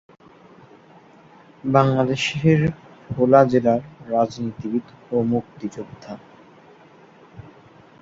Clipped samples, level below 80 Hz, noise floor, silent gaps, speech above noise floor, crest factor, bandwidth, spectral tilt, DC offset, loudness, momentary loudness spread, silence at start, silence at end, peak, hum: under 0.1%; -54 dBFS; -49 dBFS; none; 29 dB; 20 dB; 7.8 kHz; -7 dB/octave; under 0.1%; -20 LUFS; 21 LU; 1.65 s; 0.6 s; -2 dBFS; none